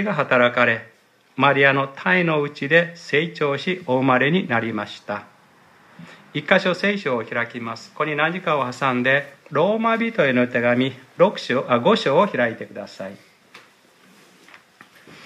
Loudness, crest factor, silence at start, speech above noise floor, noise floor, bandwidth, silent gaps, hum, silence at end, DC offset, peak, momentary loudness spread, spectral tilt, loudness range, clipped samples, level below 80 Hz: -20 LUFS; 20 dB; 0 s; 33 dB; -53 dBFS; 12 kHz; none; none; 0 s; under 0.1%; -2 dBFS; 14 LU; -6 dB/octave; 5 LU; under 0.1%; -70 dBFS